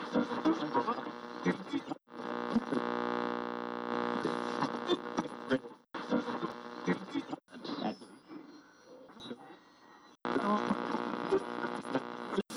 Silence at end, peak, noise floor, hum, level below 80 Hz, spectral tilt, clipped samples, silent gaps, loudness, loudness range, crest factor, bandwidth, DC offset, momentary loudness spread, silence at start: 0 s; -20 dBFS; -59 dBFS; none; -74 dBFS; -6 dB/octave; under 0.1%; none; -36 LUFS; 6 LU; 16 dB; 11 kHz; under 0.1%; 15 LU; 0 s